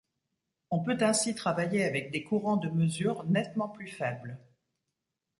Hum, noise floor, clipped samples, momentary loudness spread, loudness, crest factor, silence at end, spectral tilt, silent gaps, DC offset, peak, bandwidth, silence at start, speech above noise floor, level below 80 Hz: none; -85 dBFS; under 0.1%; 9 LU; -30 LUFS; 18 dB; 1 s; -5 dB/octave; none; under 0.1%; -14 dBFS; 11.5 kHz; 0.7 s; 55 dB; -70 dBFS